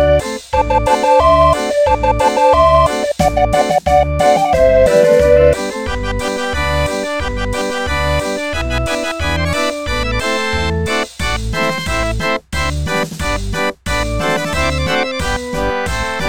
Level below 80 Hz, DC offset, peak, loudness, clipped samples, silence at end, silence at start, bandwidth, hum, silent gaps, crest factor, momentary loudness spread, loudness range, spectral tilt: -24 dBFS; 2%; 0 dBFS; -15 LUFS; under 0.1%; 0 s; 0 s; 17.5 kHz; none; none; 14 dB; 9 LU; 6 LU; -4.5 dB/octave